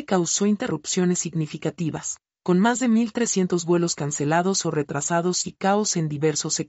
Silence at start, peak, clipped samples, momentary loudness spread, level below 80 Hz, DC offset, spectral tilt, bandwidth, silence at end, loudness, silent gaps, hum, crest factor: 0 s; -8 dBFS; under 0.1%; 7 LU; -64 dBFS; under 0.1%; -4.5 dB/octave; 8.2 kHz; 0 s; -23 LUFS; none; none; 14 dB